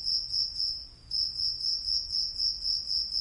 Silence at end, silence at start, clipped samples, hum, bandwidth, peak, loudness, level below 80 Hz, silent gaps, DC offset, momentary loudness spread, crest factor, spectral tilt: 0 s; 0 s; under 0.1%; none; 11.5 kHz; -16 dBFS; -28 LUFS; -54 dBFS; none; under 0.1%; 4 LU; 14 dB; 0 dB/octave